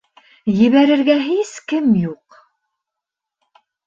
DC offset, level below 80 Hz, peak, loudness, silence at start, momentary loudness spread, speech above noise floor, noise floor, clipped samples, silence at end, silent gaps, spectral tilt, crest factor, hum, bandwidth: under 0.1%; -58 dBFS; -2 dBFS; -16 LUFS; 0.45 s; 10 LU; 69 dB; -83 dBFS; under 0.1%; 1.7 s; none; -6.5 dB/octave; 16 dB; none; 7.6 kHz